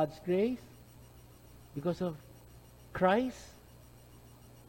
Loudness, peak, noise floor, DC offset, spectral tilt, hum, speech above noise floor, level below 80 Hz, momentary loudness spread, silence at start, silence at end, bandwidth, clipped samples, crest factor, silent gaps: -33 LUFS; -14 dBFS; -56 dBFS; under 0.1%; -6.5 dB/octave; none; 24 dB; -60 dBFS; 27 LU; 0 s; 0.4 s; 16.5 kHz; under 0.1%; 22 dB; none